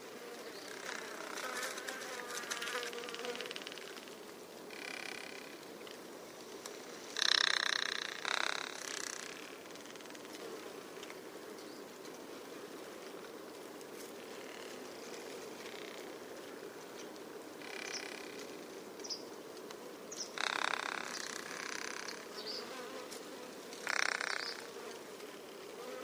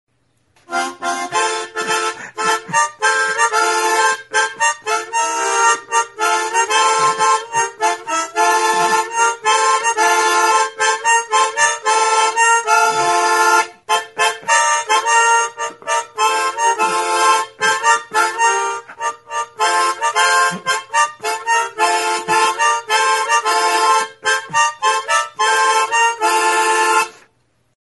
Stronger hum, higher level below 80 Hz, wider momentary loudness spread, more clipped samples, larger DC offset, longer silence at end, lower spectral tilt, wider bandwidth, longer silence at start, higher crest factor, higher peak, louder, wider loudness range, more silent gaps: neither; second, -86 dBFS vs -70 dBFS; first, 14 LU vs 7 LU; neither; neither; second, 0 s vs 0.7 s; about the same, -0.5 dB/octave vs 0 dB/octave; first, over 20 kHz vs 12 kHz; second, 0 s vs 0.7 s; first, 34 dB vs 16 dB; second, -8 dBFS vs 0 dBFS; second, -41 LUFS vs -15 LUFS; first, 13 LU vs 3 LU; neither